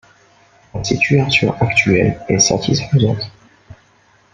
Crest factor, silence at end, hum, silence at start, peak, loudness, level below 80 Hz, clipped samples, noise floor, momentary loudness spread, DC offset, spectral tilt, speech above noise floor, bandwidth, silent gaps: 16 dB; 0.6 s; none; 0.75 s; -2 dBFS; -15 LUFS; -42 dBFS; under 0.1%; -53 dBFS; 12 LU; under 0.1%; -4.5 dB/octave; 38 dB; 9.6 kHz; none